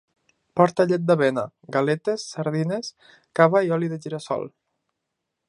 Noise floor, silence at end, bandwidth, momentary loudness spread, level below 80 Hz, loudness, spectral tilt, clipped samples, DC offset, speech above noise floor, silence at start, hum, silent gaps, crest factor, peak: -81 dBFS; 1 s; 11 kHz; 12 LU; -70 dBFS; -23 LUFS; -6.5 dB/octave; under 0.1%; under 0.1%; 59 dB; 0.55 s; none; none; 22 dB; 0 dBFS